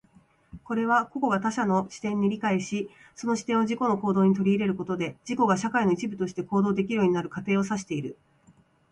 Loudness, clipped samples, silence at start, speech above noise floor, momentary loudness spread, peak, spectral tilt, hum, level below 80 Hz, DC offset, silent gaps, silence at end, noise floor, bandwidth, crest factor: -26 LUFS; under 0.1%; 0.55 s; 34 dB; 9 LU; -10 dBFS; -6.5 dB/octave; none; -64 dBFS; under 0.1%; none; 0.8 s; -60 dBFS; 10.5 kHz; 16 dB